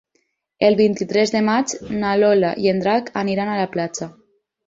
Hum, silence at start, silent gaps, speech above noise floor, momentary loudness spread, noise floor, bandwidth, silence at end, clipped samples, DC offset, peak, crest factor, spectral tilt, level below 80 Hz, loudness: none; 0.6 s; none; 50 dB; 9 LU; -68 dBFS; 8 kHz; 0.55 s; under 0.1%; under 0.1%; -2 dBFS; 18 dB; -5 dB/octave; -56 dBFS; -19 LUFS